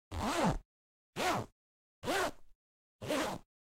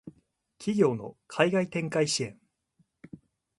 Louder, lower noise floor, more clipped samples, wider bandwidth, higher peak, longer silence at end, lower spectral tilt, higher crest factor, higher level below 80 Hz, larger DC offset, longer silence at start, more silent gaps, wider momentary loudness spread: second, -36 LUFS vs -28 LUFS; first, under -90 dBFS vs -71 dBFS; neither; first, 16 kHz vs 11.5 kHz; second, -18 dBFS vs -8 dBFS; second, 0.2 s vs 0.4 s; about the same, -4 dB/octave vs -4.5 dB/octave; about the same, 20 dB vs 22 dB; first, -52 dBFS vs -70 dBFS; neither; about the same, 0.1 s vs 0.05 s; first, 0.65-1.13 s, 1.52-2.02 s, 2.55-2.99 s vs none; about the same, 13 LU vs 12 LU